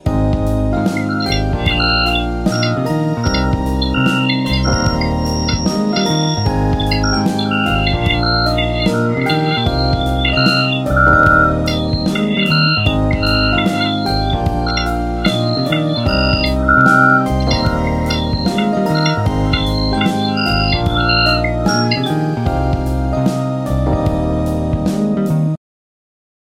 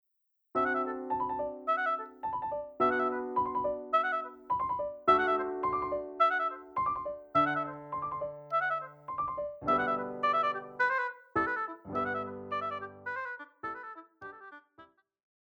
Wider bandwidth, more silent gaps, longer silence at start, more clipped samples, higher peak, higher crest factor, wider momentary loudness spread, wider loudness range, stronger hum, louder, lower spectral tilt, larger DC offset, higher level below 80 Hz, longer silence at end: first, 16 kHz vs 7.8 kHz; neither; second, 0.05 s vs 0.55 s; neither; first, 0 dBFS vs -12 dBFS; second, 14 dB vs 20 dB; second, 5 LU vs 11 LU; second, 3 LU vs 6 LU; neither; first, -15 LUFS vs -32 LUFS; about the same, -6 dB/octave vs -6.5 dB/octave; neither; first, -24 dBFS vs -66 dBFS; first, 1 s vs 0.7 s